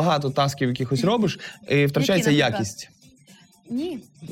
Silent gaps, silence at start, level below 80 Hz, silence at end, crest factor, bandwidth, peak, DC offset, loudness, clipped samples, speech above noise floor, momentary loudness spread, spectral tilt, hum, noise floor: none; 0 s; -58 dBFS; 0 s; 14 dB; 16.5 kHz; -10 dBFS; under 0.1%; -22 LUFS; under 0.1%; 30 dB; 14 LU; -5.5 dB/octave; none; -53 dBFS